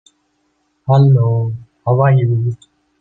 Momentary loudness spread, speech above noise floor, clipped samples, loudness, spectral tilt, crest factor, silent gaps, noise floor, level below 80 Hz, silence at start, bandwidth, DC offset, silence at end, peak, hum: 13 LU; 51 dB; under 0.1%; -14 LUFS; -10 dB/octave; 14 dB; none; -64 dBFS; -56 dBFS; 0.85 s; 4.3 kHz; under 0.1%; 0.45 s; -2 dBFS; none